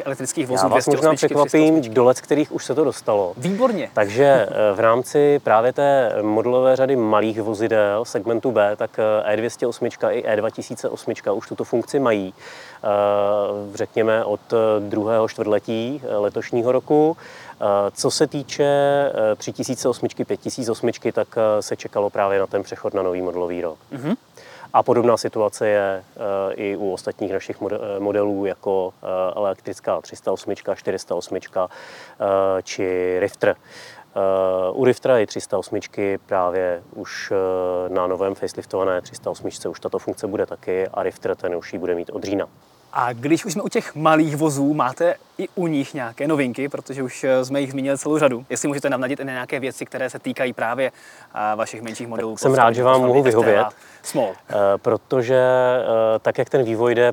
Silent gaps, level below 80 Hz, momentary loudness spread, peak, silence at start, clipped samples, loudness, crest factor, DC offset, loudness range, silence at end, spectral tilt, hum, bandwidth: none; -68 dBFS; 10 LU; 0 dBFS; 0 s; under 0.1%; -21 LUFS; 20 dB; under 0.1%; 7 LU; 0 s; -5.5 dB/octave; none; 19 kHz